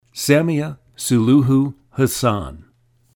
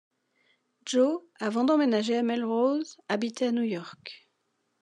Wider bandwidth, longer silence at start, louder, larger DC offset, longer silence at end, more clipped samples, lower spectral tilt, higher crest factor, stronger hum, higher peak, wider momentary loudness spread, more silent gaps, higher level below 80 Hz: first, 19 kHz vs 10.5 kHz; second, 0.15 s vs 0.85 s; first, -18 LUFS vs -27 LUFS; neither; about the same, 0.55 s vs 0.65 s; neither; about the same, -6 dB/octave vs -5 dB/octave; about the same, 16 dB vs 16 dB; neither; first, -2 dBFS vs -12 dBFS; second, 12 LU vs 15 LU; neither; first, -46 dBFS vs -88 dBFS